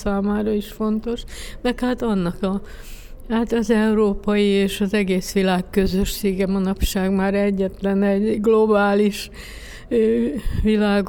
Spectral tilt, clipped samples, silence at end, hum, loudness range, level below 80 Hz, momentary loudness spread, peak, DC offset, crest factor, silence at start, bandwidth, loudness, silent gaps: -6 dB/octave; under 0.1%; 0 s; none; 4 LU; -34 dBFS; 12 LU; -6 dBFS; under 0.1%; 14 dB; 0 s; 19 kHz; -20 LUFS; none